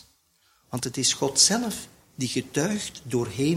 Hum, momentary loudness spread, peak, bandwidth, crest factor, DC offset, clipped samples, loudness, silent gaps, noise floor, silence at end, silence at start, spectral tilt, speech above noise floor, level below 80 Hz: none; 15 LU; -4 dBFS; 16.5 kHz; 22 dB; under 0.1%; under 0.1%; -24 LUFS; none; -65 dBFS; 0 s; 0.7 s; -3 dB/octave; 39 dB; -58 dBFS